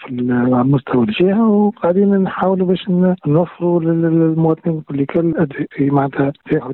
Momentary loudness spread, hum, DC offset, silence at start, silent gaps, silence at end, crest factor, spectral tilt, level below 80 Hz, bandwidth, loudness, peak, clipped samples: 5 LU; none; under 0.1%; 0 s; none; 0 s; 10 dB; -11.5 dB/octave; -52 dBFS; 4.2 kHz; -16 LUFS; -4 dBFS; under 0.1%